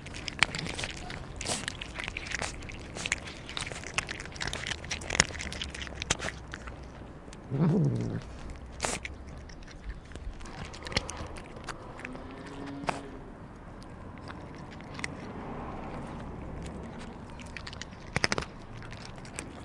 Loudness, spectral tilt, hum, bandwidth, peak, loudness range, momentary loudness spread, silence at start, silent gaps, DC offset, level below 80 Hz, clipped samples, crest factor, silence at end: -35 LUFS; -3.5 dB/octave; none; 11.5 kHz; -2 dBFS; 9 LU; 17 LU; 0 s; none; under 0.1%; -48 dBFS; under 0.1%; 34 dB; 0 s